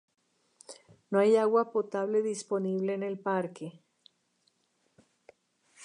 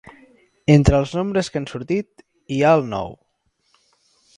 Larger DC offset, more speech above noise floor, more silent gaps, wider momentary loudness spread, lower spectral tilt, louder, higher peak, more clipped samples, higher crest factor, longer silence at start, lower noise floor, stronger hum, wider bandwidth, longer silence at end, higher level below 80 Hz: neither; second, 46 dB vs 50 dB; neither; first, 21 LU vs 14 LU; about the same, -6 dB/octave vs -7 dB/octave; second, -29 LUFS vs -19 LUFS; second, -12 dBFS vs 0 dBFS; neither; about the same, 20 dB vs 20 dB; about the same, 0.7 s vs 0.7 s; first, -74 dBFS vs -68 dBFS; neither; about the same, 11 kHz vs 10.5 kHz; second, 0 s vs 1.25 s; second, -86 dBFS vs -34 dBFS